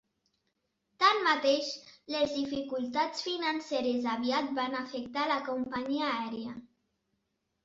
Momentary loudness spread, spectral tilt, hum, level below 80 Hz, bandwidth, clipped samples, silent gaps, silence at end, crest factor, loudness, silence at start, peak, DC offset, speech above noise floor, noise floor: 11 LU; -3 dB/octave; none; -72 dBFS; 8 kHz; under 0.1%; none; 1 s; 22 dB; -31 LUFS; 1 s; -10 dBFS; under 0.1%; 49 dB; -81 dBFS